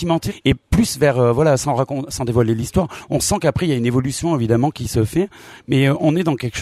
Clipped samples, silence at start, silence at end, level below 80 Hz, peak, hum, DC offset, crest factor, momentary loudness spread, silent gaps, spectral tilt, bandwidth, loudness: under 0.1%; 0 s; 0 s; -36 dBFS; -2 dBFS; none; under 0.1%; 14 dB; 6 LU; none; -6 dB/octave; 15 kHz; -18 LUFS